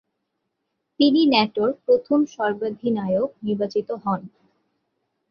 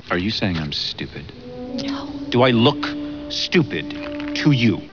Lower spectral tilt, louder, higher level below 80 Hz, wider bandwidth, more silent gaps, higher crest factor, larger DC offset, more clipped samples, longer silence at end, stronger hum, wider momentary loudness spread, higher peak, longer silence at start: about the same, -6.5 dB/octave vs -6 dB/octave; about the same, -22 LUFS vs -21 LUFS; second, -66 dBFS vs -46 dBFS; first, 6.8 kHz vs 5.4 kHz; neither; about the same, 20 dB vs 18 dB; second, under 0.1% vs 0.3%; neither; first, 1.05 s vs 0 s; neither; second, 9 LU vs 14 LU; about the same, -2 dBFS vs -2 dBFS; first, 1 s vs 0.05 s